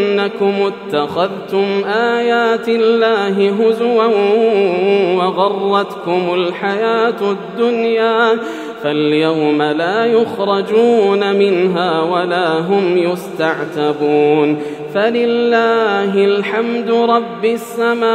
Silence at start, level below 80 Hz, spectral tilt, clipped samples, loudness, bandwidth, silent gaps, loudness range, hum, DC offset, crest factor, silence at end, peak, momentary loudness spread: 0 s; -70 dBFS; -6 dB/octave; under 0.1%; -14 LUFS; 14 kHz; none; 2 LU; none; under 0.1%; 14 dB; 0 s; 0 dBFS; 6 LU